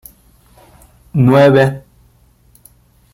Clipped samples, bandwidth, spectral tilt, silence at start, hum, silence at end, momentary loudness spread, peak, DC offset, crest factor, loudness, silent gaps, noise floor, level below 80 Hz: under 0.1%; 16 kHz; -8 dB/octave; 1.15 s; none; 1.35 s; 15 LU; -2 dBFS; under 0.1%; 14 dB; -11 LUFS; none; -50 dBFS; -48 dBFS